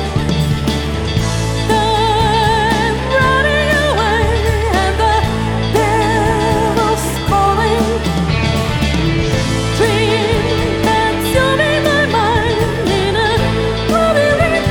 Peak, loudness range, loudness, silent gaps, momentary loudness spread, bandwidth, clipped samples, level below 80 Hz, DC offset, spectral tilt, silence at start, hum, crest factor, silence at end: 0 dBFS; 1 LU; -14 LUFS; none; 4 LU; 19 kHz; under 0.1%; -24 dBFS; under 0.1%; -5 dB/octave; 0 s; none; 12 dB; 0 s